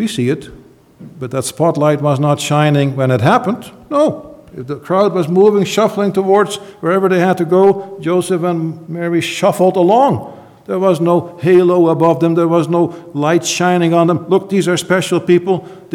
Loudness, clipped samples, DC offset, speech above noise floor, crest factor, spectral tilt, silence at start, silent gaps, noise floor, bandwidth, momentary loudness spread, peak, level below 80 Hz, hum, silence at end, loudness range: -14 LUFS; under 0.1%; under 0.1%; 25 dB; 14 dB; -6 dB/octave; 0 s; none; -38 dBFS; 15.5 kHz; 10 LU; 0 dBFS; -56 dBFS; none; 0 s; 2 LU